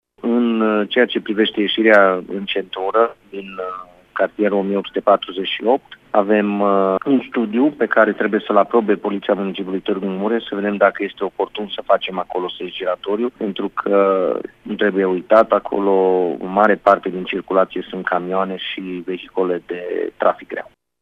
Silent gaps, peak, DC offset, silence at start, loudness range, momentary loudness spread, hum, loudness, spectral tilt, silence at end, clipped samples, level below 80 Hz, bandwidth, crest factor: none; 0 dBFS; under 0.1%; 0.25 s; 4 LU; 10 LU; none; -18 LUFS; -7.5 dB/octave; 0.4 s; under 0.1%; -60 dBFS; 6 kHz; 18 dB